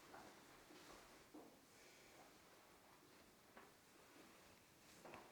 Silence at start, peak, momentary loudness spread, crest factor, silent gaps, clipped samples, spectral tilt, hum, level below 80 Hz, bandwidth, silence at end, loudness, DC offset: 0 s; -44 dBFS; 6 LU; 22 dB; none; under 0.1%; -3 dB/octave; none; -86 dBFS; over 20 kHz; 0 s; -65 LUFS; under 0.1%